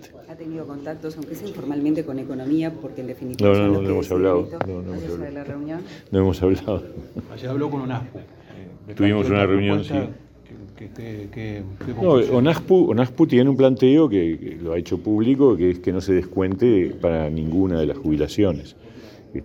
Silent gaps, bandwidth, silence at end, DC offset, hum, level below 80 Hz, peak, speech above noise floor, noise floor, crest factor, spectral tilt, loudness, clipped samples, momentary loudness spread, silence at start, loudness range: none; 17.5 kHz; 0 s; under 0.1%; none; -48 dBFS; -2 dBFS; 22 dB; -42 dBFS; 18 dB; -8 dB/octave; -21 LUFS; under 0.1%; 17 LU; 0 s; 7 LU